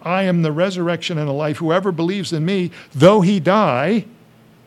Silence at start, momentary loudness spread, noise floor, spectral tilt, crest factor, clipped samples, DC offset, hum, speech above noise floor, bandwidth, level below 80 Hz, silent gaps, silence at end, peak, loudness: 0.05 s; 9 LU; -48 dBFS; -6.5 dB/octave; 18 dB; under 0.1%; under 0.1%; none; 32 dB; 12 kHz; -60 dBFS; none; 0.6 s; 0 dBFS; -17 LUFS